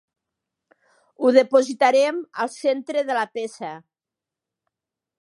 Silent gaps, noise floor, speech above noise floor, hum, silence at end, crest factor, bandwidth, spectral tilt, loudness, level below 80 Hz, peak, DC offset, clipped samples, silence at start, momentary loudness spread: none; -88 dBFS; 68 dB; none; 1.45 s; 22 dB; 11.5 kHz; -3.5 dB/octave; -21 LUFS; -82 dBFS; -2 dBFS; under 0.1%; under 0.1%; 1.2 s; 15 LU